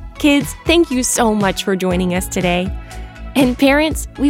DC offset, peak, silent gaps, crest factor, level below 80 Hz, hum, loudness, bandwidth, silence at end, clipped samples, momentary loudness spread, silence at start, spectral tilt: under 0.1%; 0 dBFS; none; 14 dB; -30 dBFS; none; -16 LUFS; 17 kHz; 0 s; under 0.1%; 9 LU; 0 s; -4 dB/octave